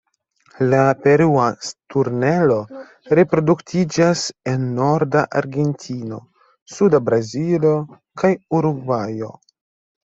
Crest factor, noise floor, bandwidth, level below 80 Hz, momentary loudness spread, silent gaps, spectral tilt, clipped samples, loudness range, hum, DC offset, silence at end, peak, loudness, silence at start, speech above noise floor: 16 dB; -59 dBFS; 8 kHz; -58 dBFS; 14 LU; 6.62-6.66 s; -6.5 dB/octave; under 0.1%; 3 LU; none; under 0.1%; 0.85 s; -2 dBFS; -18 LUFS; 0.6 s; 41 dB